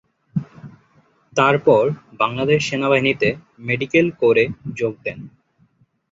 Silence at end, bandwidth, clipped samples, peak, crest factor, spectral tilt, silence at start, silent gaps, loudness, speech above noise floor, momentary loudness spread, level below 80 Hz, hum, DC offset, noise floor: 0.85 s; 7.8 kHz; under 0.1%; -2 dBFS; 18 dB; -6 dB/octave; 0.35 s; none; -19 LUFS; 41 dB; 13 LU; -56 dBFS; none; under 0.1%; -60 dBFS